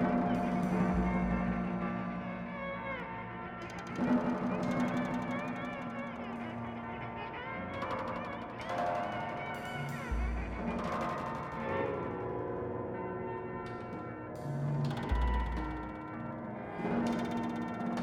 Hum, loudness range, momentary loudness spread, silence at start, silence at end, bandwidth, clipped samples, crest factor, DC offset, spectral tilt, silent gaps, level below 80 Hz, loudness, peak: none; 3 LU; 10 LU; 0 s; 0 s; 13 kHz; under 0.1%; 16 dB; under 0.1%; -7.5 dB/octave; none; -46 dBFS; -36 LUFS; -20 dBFS